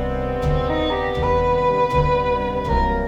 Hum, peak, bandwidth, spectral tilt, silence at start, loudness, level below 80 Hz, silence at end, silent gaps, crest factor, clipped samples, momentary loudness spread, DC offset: none; -6 dBFS; 8.2 kHz; -7.5 dB/octave; 0 s; -20 LUFS; -28 dBFS; 0 s; none; 14 dB; under 0.1%; 4 LU; 0.1%